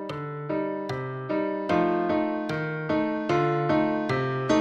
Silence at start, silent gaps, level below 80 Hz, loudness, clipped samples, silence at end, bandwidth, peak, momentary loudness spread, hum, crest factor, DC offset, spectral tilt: 0 s; none; -58 dBFS; -27 LUFS; under 0.1%; 0 s; 8.4 kHz; -10 dBFS; 7 LU; none; 16 dB; under 0.1%; -7 dB/octave